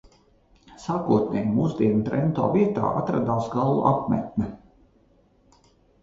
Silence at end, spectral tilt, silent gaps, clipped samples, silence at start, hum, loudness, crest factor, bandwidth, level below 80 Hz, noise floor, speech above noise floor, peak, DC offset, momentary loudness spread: 1.45 s; -9 dB/octave; none; under 0.1%; 0.7 s; none; -24 LUFS; 20 dB; 7.6 kHz; -52 dBFS; -60 dBFS; 37 dB; -4 dBFS; under 0.1%; 8 LU